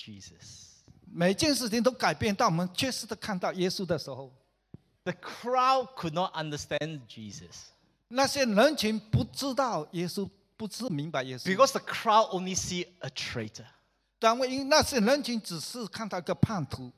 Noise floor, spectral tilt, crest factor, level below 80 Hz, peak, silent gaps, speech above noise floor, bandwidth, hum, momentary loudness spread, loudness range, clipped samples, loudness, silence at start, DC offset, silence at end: -56 dBFS; -4.5 dB/octave; 22 dB; -56 dBFS; -8 dBFS; none; 26 dB; 15.5 kHz; none; 18 LU; 3 LU; under 0.1%; -29 LUFS; 0 s; under 0.1%; 0.05 s